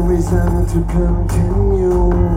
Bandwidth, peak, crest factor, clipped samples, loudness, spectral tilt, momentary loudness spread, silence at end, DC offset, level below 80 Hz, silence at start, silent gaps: 14 kHz; -4 dBFS; 10 dB; under 0.1%; -16 LUFS; -8.5 dB/octave; 2 LU; 0 s; under 0.1%; -18 dBFS; 0 s; none